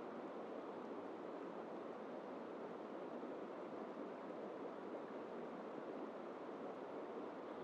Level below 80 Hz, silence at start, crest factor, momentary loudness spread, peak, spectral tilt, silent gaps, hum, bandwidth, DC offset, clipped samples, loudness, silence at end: under -90 dBFS; 0 s; 12 dB; 1 LU; -38 dBFS; -7 dB/octave; none; none; 9.4 kHz; under 0.1%; under 0.1%; -50 LUFS; 0 s